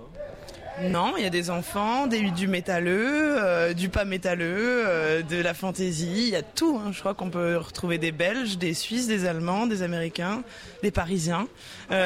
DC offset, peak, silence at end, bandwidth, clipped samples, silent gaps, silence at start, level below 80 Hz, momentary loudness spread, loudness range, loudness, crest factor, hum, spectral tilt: under 0.1%; -12 dBFS; 0 s; 16 kHz; under 0.1%; none; 0 s; -50 dBFS; 7 LU; 3 LU; -26 LUFS; 14 dB; none; -5 dB/octave